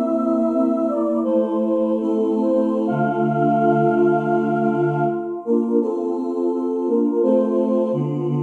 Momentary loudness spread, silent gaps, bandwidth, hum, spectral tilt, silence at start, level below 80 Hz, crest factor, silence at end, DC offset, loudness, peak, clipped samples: 5 LU; none; 4.4 kHz; none; -10 dB/octave; 0 s; -72 dBFS; 12 dB; 0 s; under 0.1%; -20 LUFS; -6 dBFS; under 0.1%